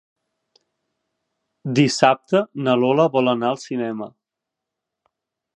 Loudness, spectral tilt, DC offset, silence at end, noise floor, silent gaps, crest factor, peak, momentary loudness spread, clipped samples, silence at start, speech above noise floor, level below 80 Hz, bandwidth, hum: -19 LUFS; -5.5 dB/octave; under 0.1%; 1.5 s; -84 dBFS; none; 22 dB; 0 dBFS; 13 LU; under 0.1%; 1.65 s; 65 dB; -70 dBFS; 10.5 kHz; none